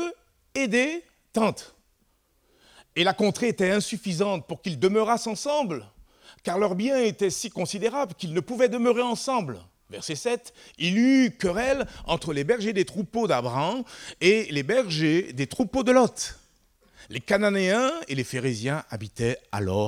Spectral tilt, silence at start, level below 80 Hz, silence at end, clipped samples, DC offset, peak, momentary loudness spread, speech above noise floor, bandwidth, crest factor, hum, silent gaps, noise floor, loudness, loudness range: -5 dB/octave; 0 s; -56 dBFS; 0 s; under 0.1%; under 0.1%; -8 dBFS; 12 LU; 43 dB; 15.5 kHz; 18 dB; none; none; -67 dBFS; -25 LUFS; 3 LU